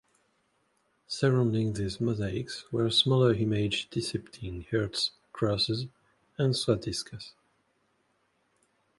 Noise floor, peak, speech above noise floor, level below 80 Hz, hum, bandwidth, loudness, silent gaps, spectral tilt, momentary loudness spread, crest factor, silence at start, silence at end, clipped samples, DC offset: -73 dBFS; -10 dBFS; 44 dB; -54 dBFS; none; 11.5 kHz; -29 LUFS; none; -5.5 dB/octave; 15 LU; 20 dB; 1.1 s; 1.7 s; under 0.1%; under 0.1%